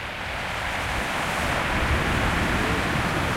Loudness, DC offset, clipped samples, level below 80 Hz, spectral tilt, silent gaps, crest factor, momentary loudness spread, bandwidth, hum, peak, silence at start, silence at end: -24 LUFS; under 0.1%; under 0.1%; -34 dBFS; -4.5 dB/octave; none; 14 dB; 5 LU; 16.5 kHz; none; -12 dBFS; 0 s; 0 s